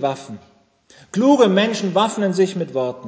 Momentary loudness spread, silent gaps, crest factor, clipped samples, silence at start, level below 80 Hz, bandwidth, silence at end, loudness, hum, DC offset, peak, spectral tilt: 13 LU; none; 16 dB; under 0.1%; 0 s; -68 dBFS; 8 kHz; 0 s; -18 LUFS; none; under 0.1%; -2 dBFS; -5.5 dB/octave